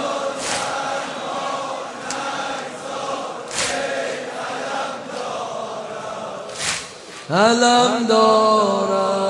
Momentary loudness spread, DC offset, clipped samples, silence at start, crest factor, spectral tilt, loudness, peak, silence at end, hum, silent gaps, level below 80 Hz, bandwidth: 14 LU; under 0.1%; under 0.1%; 0 s; 20 dB; -3 dB/octave; -21 LUFS; -2 dBFS; 0 s; none; none; -62 dBFS; 11.5 kHz